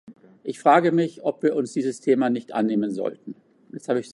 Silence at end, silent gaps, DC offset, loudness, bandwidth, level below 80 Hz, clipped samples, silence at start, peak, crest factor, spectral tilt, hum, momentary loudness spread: 0 s; none; under 0.1%; -23 LUFS; 11.5 kHz; -76 dBFS; under 0.1%; 0.1 s; -4 dBFS; 20 dB; -6.5 dB/octave; none; 19 LU